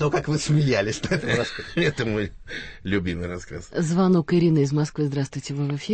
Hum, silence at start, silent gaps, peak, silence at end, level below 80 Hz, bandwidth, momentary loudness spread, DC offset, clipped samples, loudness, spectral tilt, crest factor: none; 0 s; none; -8 dBFS; 0 s; -46 dBFS; 8.8 kHz; 12 LU; under 0.1%; under 0.1%; -24 LUFS; -6 dB/octave; 16 dB